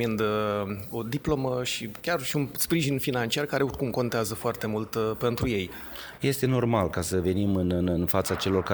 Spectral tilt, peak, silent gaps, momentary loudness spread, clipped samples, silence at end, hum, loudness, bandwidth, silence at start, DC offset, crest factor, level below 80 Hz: -5.5 dB/octave; -8 dBFS; none; 6 LU; under 0.1%; 0 s; none; -27 LUFS; over 20 kHz; 0 s; under 0.1%; 18 dB; -48 dBFS